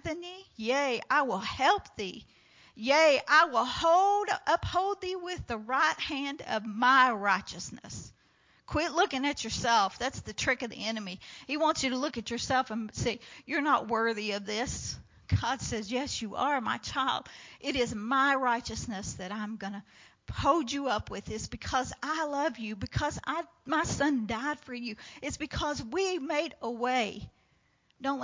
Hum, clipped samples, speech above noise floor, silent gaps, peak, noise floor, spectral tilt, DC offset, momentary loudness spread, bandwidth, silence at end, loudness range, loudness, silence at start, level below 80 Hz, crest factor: none; under 0.1%; 39 dB; none; -10 dBFS; -70 dBFS; -3.5 dB/octave; under 0.1%; 14 LU; 7.8 kHz; 0 s; 6 LU; -30 LUFS; 0.05 s; -52 dBFS; 22 dB